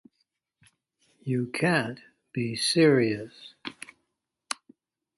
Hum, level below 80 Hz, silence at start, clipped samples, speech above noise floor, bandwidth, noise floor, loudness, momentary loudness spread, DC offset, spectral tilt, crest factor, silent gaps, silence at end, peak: none; -70 dBFS; 1.25 s; under 0.1%; 55 dB; 12 kHz; -81 dBFS; -26 LUFS; 22 LU; under 0.1%; -5 dB/octave; 20 dB; none; 0.65 s; -10 dBFS